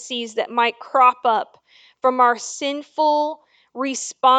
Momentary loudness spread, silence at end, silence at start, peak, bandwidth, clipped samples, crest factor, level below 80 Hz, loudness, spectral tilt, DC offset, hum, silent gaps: 11 LU; 0 s; 0 s; -2 dBFS; 9.4 kHz; under 0.1%; 18 dB; -78 dBFS; -20 LUFS; -1 dB/octave; under 0.1%; none; none